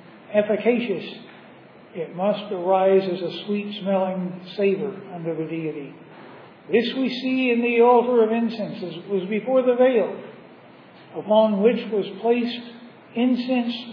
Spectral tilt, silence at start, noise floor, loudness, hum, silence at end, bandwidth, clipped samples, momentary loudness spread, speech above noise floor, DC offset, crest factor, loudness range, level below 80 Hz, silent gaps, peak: -8.5 dB/octave; 0.15 s; -47 dBFS; -22 LUFS; none; 0 s; 5.4 kHz; under 0.1%; 16 LU; 25 dB; under 0.1%; 18 dB; 6 LU; -86 dBFS; none; -6 dBFS